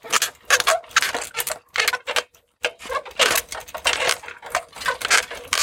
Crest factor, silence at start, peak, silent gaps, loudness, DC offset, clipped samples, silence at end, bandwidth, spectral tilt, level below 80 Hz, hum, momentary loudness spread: 22 dB; 0.05 s; -2 dBFS; none; -21 LUFS; under 0.1%; under 0.1%; 0 s; 17 kHz; 1 dB/octave; -56 dBFS; none; 10 LU